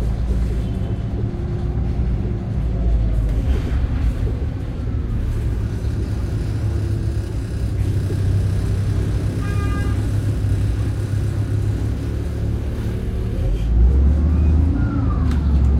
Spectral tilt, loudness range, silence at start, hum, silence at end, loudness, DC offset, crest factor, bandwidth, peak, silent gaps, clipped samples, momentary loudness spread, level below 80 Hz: -8 dB/octave; 3 LU; 0 s; none; 0 s; -21 LUFS; under 0.1%; 14 dB; 11 kHz; -4 dBFS; none; under 0.1%; 7 LU; -22 dBFS